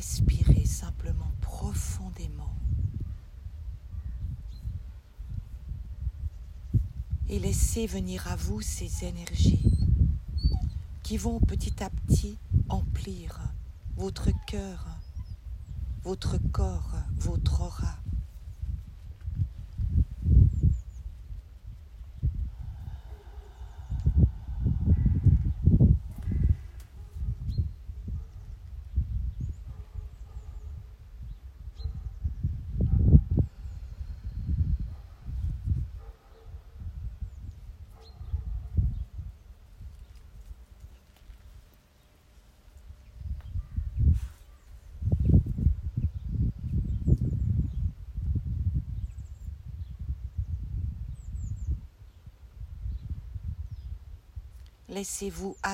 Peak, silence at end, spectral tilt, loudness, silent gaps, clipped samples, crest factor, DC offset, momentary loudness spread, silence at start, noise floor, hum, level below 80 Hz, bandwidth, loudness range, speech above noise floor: -4 dBFS; 0 s; -6.5 dB/octave; -31 LUFS; none; under 0.1%; 26 dB; under 0.1%; 21 LU; 0 s; -59 dBFS; none; -34 dBFS; 15 kHz; 11 LU; 32 dB